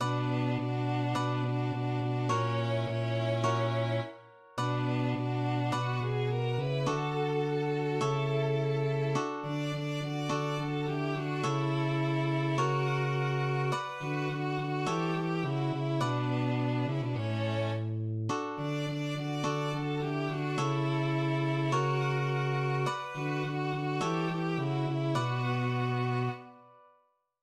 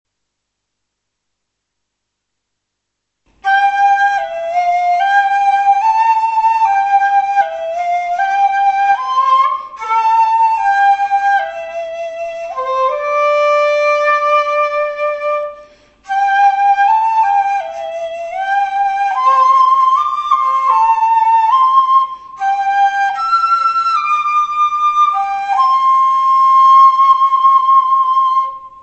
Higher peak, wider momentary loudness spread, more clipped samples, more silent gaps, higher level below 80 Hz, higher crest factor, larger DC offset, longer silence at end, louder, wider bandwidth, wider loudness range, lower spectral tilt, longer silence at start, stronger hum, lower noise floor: second, -16 dBFS vs 0 dBFS; second, 4 LU vs 10 LU; neither; neither; second, -66 dBFS vs -58 dBFS; about the same, 14 dB vs 12 dB; neither; first, 0.75 s vs 0 s; second, -32 LUFS vs -12 LUFS; first, 10.5 kHz vs 8.2 kHz; second, 2 LU vs 5 LU; first, -6.5 dB/octave vs -0.5 dB/octave; second, 0 s vs 3.45 s; second, none vs 50 Hz at -60 dBFS; second, -70 dBFS vs -74 dBFS